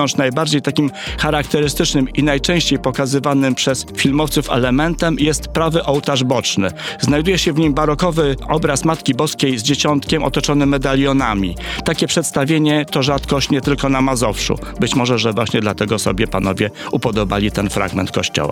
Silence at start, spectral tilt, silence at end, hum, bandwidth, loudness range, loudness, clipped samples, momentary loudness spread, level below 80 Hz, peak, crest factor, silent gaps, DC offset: 0 s; -4.5 dB/octave; 0 s; none; 17 kHz; 1 LU; -16 LUFS; under 0.1%; 4 LU; -32 dBFS; -2 dBFS; 14 dB; none; under 0.1%